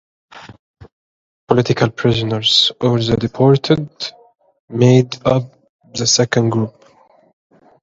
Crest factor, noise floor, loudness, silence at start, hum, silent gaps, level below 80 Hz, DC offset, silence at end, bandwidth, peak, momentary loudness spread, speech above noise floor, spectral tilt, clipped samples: 16 dB; -50 dBFS; -15 LUFS; 0.35 s; none; 0.59-0.74 s, 0.92-1.47 s, 4.60-4.68 s, 5.69-5.79 s; -48 dBFS; under 0.1%; 1.15 s; 7.8 kHz; 0 dBFS; 14 LU; 36 dB; -5 dB/octave; under 0.1%